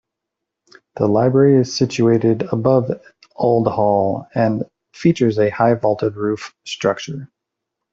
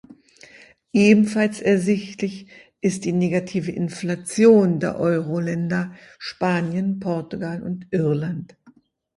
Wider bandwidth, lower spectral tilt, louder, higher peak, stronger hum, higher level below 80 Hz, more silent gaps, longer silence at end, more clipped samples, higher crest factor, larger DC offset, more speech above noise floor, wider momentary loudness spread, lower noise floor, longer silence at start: second, 7.8 kHz vs 11.5 kHz; about the same, -7 dB/octave vs -6.5 dB/octave; first, -17 LUFS vs -21 LUFS; about the same, -2 dBFS vs -2 dBFS; neither; about the same, -56 dBFS vs -60 dBFS; neither; first, 0.65 s vs 0.45 s; neither; about the same, 16 dB vs 20 dB; neither; first, 64 dB vs 34 dB; about the same, 12 LU vs 14 LU; first, -81 dBFS vs -55 dBFS; first, 0.95 s vs 0.1 s